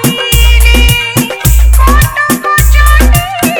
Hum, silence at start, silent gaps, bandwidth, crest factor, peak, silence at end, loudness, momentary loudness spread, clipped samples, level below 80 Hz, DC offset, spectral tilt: none; 0 s; none; over 20 kHz; 6 dB; 0 dBFS; 0 s; -7 LUFS; 4 LU; 3%; -8 dBFS; under 0.1%; -4 dB/octave